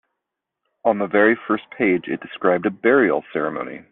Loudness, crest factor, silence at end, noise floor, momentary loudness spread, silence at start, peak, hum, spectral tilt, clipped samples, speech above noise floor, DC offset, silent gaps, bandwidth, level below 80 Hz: -20 LUFS; 18 dB; 0.1 s; -82 dBFS; 9 LU; 0.85 s; -2 dBFS; none; -4.5 dB/octave; under 0.1%; 62 dB; under 0.1%; none; 4 kHz; -66 dBFS